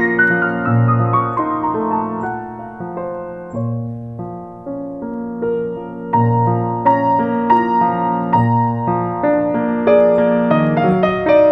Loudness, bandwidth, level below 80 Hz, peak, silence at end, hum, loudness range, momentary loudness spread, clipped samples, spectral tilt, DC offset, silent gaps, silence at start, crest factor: -16 LUFS; 5 kHz; -48 dBFS; -2 dBFS; 0 s; none; 10 LU; 14 LU; under 0.1%; -10 dB/octave; under 0.1%; none; 0 s; 14 dB